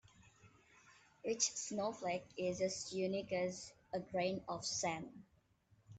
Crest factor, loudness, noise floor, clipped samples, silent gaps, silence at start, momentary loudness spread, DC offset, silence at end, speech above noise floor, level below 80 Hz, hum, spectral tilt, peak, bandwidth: 22 dB; -41 LUFS; -73 dBFS; under 0.1%; none; 0.2 s; 10 LU; under 0.1%; 0 s; 32 dB; -76 dBFS; none; -3 dB/octave; -20 dBFS; 9 kHz